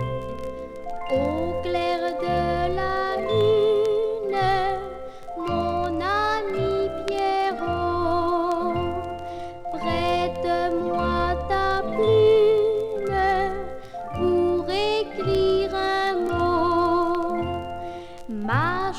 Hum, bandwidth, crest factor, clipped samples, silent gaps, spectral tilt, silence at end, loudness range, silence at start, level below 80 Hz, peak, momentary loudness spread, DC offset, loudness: none; 12.5 kHz; 16 dB; under 0.1%; none; -6.5 dB/octave; 0 s; 4 LU; 0 s; -42 dBFS; -8 dBFS; 13 LU; under 0.1%; -23 LUFS